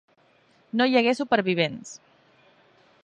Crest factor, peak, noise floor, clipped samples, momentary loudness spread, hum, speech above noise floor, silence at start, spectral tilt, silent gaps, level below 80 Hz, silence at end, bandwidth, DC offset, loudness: 20 dB; -8 dBFS; -61 dBFS; under 0.1%; 21 LU; none; 38 dB; 0.75 s; -5 dB/octave; none; -74 dBFS; 1.1 s; 10 kHz; under 0.1%; -23 LUFS